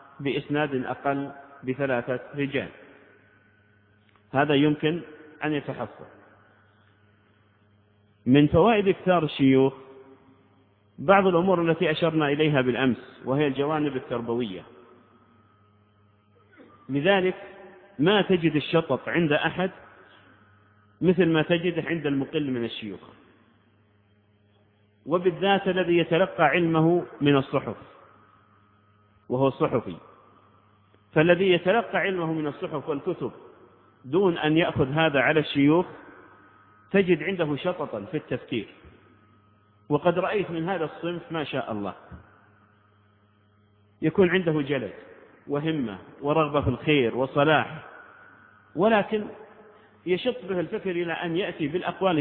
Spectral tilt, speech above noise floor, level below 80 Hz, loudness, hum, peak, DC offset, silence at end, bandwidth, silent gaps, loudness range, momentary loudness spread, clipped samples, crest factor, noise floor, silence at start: -10.5 dB/octave; 38 dB; -58 dBFS; -25 LUFS; none; -4 dBFS; under 0.1%; 0 s; 4.4 kHz; none; 8 LU; 12 LU; under 0.1%; 22 dB; -62 dBFS; 0.2 s